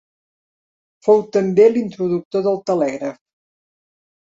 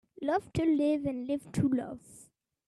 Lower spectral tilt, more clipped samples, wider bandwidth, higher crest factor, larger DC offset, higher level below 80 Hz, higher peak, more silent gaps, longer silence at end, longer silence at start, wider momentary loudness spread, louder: about the same, -7.5 dB/octave vs -7.5 dB/octave; neither; second, 7.6 kHz vs 12.5 kHz; about the same, 18 dB vs 14 dB; neither; second, -66 dBFS vs -60 dBFS; first, -2 dBFS vs -18 dBFS; first, 2.25-2.31 s vs none; first, 1.2 s vs 0.45 s; first, 1.05 s vs 0.2 s; about the same, 10 LU vs 8 LU; first, -17 LUFS vs -31 LUFS